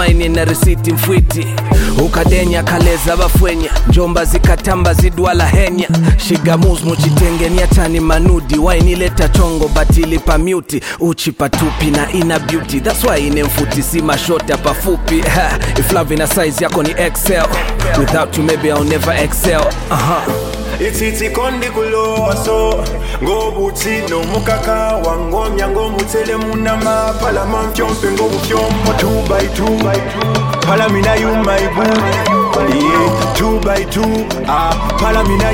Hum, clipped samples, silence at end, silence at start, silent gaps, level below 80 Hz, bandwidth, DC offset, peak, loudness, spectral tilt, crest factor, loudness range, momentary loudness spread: none; under 0.1%; 0 s; 0 s; none; -18 dBFS; 17 kHz; under 0.1%; 0 dBFS; -13 LUFS; -5 dB/octave; 12 dB; 3 LU; 4 LU